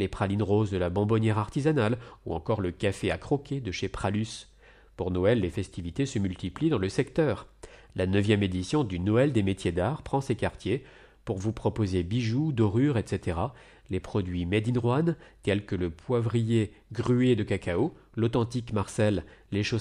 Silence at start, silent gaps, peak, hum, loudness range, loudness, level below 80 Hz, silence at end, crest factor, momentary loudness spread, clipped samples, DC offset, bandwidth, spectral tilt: 0 s; none; -12 dBFS; none; 3 LU; -28 LUFS; -50 dBFS; 0 s; 16 dB; 8 LU; under 0.1%; under 0.1%; 11 kHz; -7 dB/octave